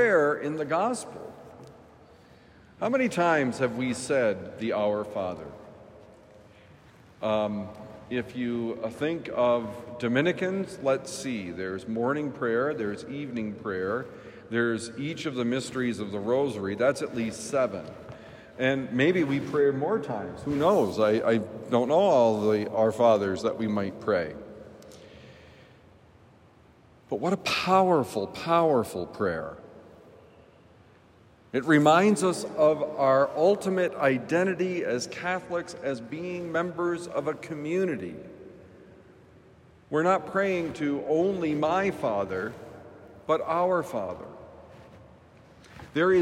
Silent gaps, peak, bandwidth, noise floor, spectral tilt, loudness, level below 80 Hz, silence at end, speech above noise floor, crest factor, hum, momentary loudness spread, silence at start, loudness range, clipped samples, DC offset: none; -8 dBFS; 16 kHz; -57 dBFS; -5.5 dB/octave; -27 LUFS; -66 dBFS; 0 s; 30 dB; 20 dB; none; 15 LU; 0 s; 8 LU; under 0.1%; under 0.1%